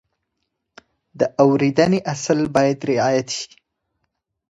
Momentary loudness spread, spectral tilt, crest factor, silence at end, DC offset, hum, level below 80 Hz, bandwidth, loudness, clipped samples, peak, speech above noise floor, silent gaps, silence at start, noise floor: 9 LU; -5.5 dB/octave; 20 dB; 1.1 s; under 0.1%; none; -58 dBFS; 9.8 kHz; -19 LUFS; under 0.1%; 0 dBFS; 58 dB; none; 1.15 s; -76 dBFS